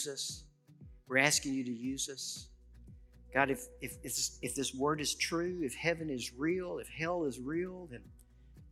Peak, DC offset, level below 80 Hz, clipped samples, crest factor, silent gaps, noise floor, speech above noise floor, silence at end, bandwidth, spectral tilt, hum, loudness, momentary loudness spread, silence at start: -12 dBFS; under 0.1%; -60 dBFS; under 0.1%; 26 dB; none; -58 dBFS; 22 dB; 0 s; 16 kHz; -3 dB/octave; none; -35 LUFS; 12 LU; 0 s